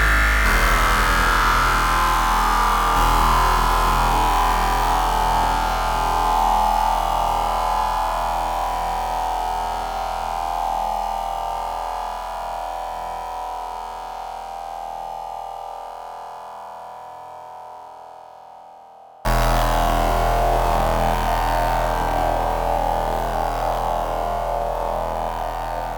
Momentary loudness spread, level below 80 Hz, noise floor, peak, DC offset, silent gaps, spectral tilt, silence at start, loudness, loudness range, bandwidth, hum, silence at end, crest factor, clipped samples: 16 LU; -28 dBFS; -44 dBFS; -4 dBFS; under 0.1%; none; -4 dB/octave; 0 s; -21 LUFS; 15 LU; 19.5 kHz; none; 0 s; 16 dB; under 0.1%